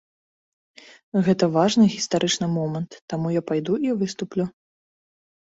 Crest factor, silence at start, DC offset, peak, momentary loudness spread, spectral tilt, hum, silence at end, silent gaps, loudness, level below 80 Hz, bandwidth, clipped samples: 18 dB; 1.15 s; under 0.1%; -6 dBFS; 10 LU; -5.5 dB/octave; none; 1 s; 3.02-3.08 s; -23 LUFS; -64 dBFS; 8 kHz; under 0.1%